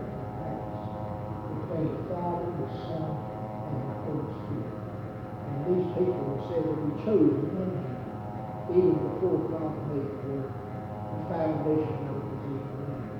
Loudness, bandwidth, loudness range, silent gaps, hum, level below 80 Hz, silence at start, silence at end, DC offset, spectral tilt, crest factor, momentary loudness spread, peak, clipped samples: -31 LUFS; 5.8 kHz; 6 LU; none; none; -56 dBFS; 0 s; 0 s; under 0.1%; -10.5 dB/octave; 20 dB; 11 LU; -10 dBFS; under 0.1%